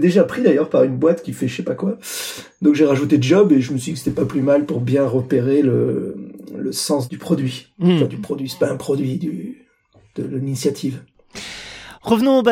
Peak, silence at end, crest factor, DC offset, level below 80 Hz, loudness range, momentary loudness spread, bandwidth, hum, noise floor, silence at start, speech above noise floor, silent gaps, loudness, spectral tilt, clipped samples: -2 dBFS; 0 s; 16 dB; under 0.1%; -56 dBFS; 7 LU; 16 LU; 16.5 kHz; none; -54 dBFS; 0 s; 37 dB; none; -18 LUFS; -6.5 dB/octave; under 0.1%